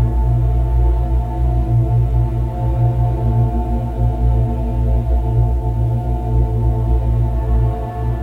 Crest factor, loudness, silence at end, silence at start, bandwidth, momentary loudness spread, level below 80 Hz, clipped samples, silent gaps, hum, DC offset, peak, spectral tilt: 12 dB; -18 LUFS; 0 s; 0 s; 3.2 kHz; 3 LU; -18 dBFS; under 0.1%; none; none; under 0.1%; -4 dBFS; -10.5 dB/octave